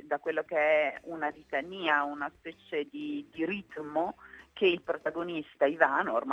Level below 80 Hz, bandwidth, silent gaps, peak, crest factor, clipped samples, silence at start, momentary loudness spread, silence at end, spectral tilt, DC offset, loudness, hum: -72 dBFS; 7.8 kHz; none; -8 dBFS; 24 dB; under 0.1%; 0.05 s; 12 LU; 0 s; -6 dB/octave; under 0.1%; -31 LUFS; none